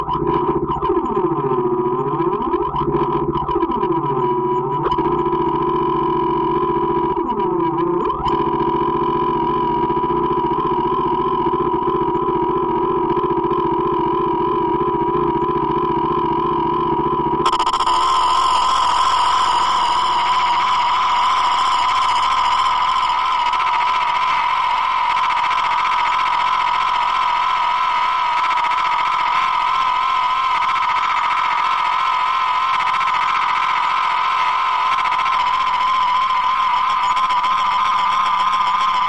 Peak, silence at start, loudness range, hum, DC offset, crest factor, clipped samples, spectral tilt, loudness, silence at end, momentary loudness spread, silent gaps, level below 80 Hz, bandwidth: -6 dBFS; 0 s; 3 LU; none; 0.5%; 10 dB; under 0.1%; -4.5 dB/octave; -17 LUFS; 0 s; 3 LU; none; -42 dBFS; 10.5 kHz